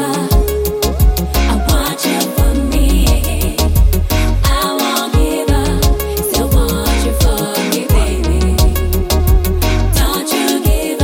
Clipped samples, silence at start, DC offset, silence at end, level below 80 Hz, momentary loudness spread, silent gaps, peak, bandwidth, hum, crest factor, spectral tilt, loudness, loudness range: under 0.1%; 0 s; under 0.1%; 0 s; -14 dBFS; 2 LU; none; 0 dBFS; 17 kHz; none; 12 dB; -5 dB/octave; -14 LUFS; 0 LU